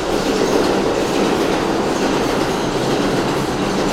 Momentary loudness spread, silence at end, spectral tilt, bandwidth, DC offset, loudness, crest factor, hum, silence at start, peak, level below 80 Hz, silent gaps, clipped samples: 3 LU; 0 s; -4.5 dB/octave; 16.5 kHz; under 0.1%; -17 LUFS; 14 dB; none; 0 s; -2 dBFS; -36 dBFS; none; under 0.1%